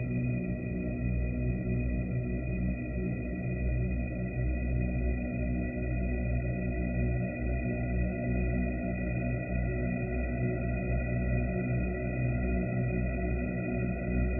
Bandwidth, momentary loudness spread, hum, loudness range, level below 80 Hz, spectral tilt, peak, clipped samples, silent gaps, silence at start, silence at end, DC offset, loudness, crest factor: 2.8 kHz; 2 LU; none; 1 LU; -36 dBFS; -13 dB/octave; -20 dBFS; under 0.1%; none; 0 s; 0 s; under 0.1%; -33 LUFS; 12 dB